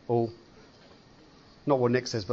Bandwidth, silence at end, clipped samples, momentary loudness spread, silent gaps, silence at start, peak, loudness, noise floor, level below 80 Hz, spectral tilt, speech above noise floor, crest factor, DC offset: 8 kHz; 0 s; under 0.1%; 10 LU; none; 0.1 s; -10 dBFS; -28 LUFS; -55 dBFS; -64 dBFS; -6 dB/octave; 28 dB; 20 dB; under 0.1%